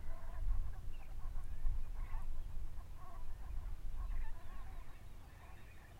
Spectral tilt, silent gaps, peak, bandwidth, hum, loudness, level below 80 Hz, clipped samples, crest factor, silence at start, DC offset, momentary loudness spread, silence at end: -6 dB/octave; none; -24 dBFS; 4.1 kHz; none; -50 LUFS; -42 dBFS; under 0.1%; 16 dB; 0 s; under 0.1%; 12 LU; 0 s